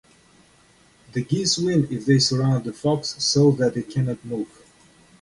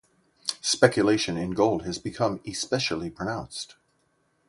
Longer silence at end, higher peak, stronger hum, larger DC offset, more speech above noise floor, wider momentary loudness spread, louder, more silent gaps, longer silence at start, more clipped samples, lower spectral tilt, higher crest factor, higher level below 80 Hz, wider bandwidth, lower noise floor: about the same, 0.75 s vs 0.75 s; second, -6 dBFS vs -2 dBFS; neither; neither; second, 35 dB vs 44 dB; about the same, 13 LU vs 13 LU; first, -22 LUFS vs -26 LUFS; neither; first, 1.15 s vs 0.45 s; neither; about the same, -5 dB/octave vs -4 dB/octave; second, 18 dB vs 24 dB; about the same, -56 dBFS vs -56 dBFS; about the same, 11.5 kHz vs 11.5 kHz; second, -56 dBFS vs -70 dBFS